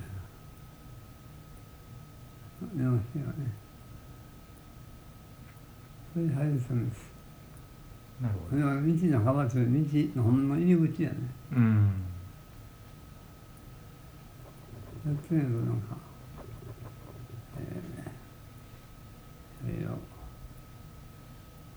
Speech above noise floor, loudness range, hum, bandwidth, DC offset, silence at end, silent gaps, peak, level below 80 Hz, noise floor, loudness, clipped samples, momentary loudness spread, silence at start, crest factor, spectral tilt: 23 dB; 16 LU; none; over 20 kHz; under 0.1%; 0 s; none; -14 dBFS; -54 dBFS; -50 dBFS; -30 LUFS; under 0.1%; 24 LU; 0 s; 20 dB; -9 dB/octave